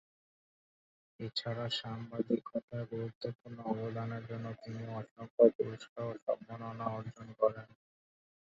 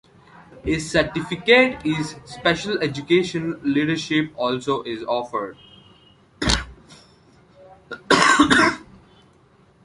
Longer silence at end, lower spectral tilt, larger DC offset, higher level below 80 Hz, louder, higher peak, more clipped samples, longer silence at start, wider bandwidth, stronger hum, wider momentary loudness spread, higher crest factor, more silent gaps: second, 0.9 s vs 1.05 s; first, -5.5 dB/octave vs -4 dB/octave; neither; second, -74 dBFS vs -42 dBFS; second, -37 LUFS vs -20 LUFS; second, -12 dBFS vs 0 dBFS; neither; first, 1.2 s vs 0.55 s; second, 7.6 kHz vs 11.5 kHz; neither; about the same, 15 LU vs 14 LU; about the same, 26 dB vs 22 dB; first, 2.63-2.68 s, 3.15-3.21 s, 3.35-3.39 s, 5.11-5.16 s, 5.30-5.38 s, 5.55-5.59 s, 5.89-5.96 s, 6.22-6.27 s vs none